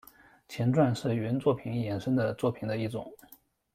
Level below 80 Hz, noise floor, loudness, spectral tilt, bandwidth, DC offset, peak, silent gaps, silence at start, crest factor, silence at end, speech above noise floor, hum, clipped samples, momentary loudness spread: -64 dBFS; -55 dBFS; -30 LUFS; -7.5 dB/octave; 15.5 kHz; under 0.1%; -12 dBFS; none; 0.5 s; 18 dB; 0.6 s; 26 dB; none; under 0.1%; 11 LU